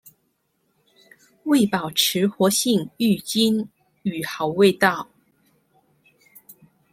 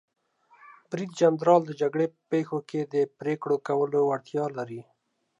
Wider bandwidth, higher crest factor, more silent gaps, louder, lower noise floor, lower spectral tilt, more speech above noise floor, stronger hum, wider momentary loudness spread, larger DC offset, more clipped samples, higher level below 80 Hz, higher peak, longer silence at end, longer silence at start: first, 16.5 kHz vs 9.8 kHz; about the same, 20 dB vs 20 dB; neither; first, -21 LUFS vs -27 LUFS; first, -70 dBFS vs -58 dBFS; second, -4 dB/octave vs -7 dB/octave; first, 50 dB vs 32 dB; neither; about the same, 13 LU vs 13 LU; neither; neither; first, -64 dBFS vs -80 dBFS; first, -2 dBFS vs -8 dBFS; second, 0.4 s vs 0.6 s; first, 1.45 s vs 0.9 s